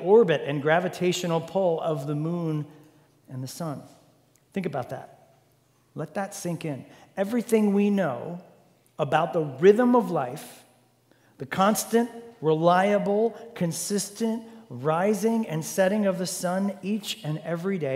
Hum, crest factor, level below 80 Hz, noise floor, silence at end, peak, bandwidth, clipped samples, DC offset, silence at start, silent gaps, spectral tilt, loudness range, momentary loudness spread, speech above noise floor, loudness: none; 20 dB; -74 dBFS; -64 dBFS; 0 s; -6 dBFS; 16 kHz; under 0.1%; under 0.1%; 0 s; none; -5.5 dB/octave; 11 LU; 17 LU; 39 dB; -25 LUFS